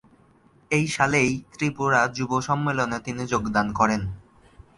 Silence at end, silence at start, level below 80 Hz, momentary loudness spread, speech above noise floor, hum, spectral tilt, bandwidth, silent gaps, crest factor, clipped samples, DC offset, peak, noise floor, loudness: 0.6 s; 0.7 s; -50 dBFS; 7 LU; 34 dB; none; -5 dB/octave; 11.5 kHz; none; 20 dB; under 0.1%; under 0.1%; -4 dBFS; -57 dBFS; -24 LUFS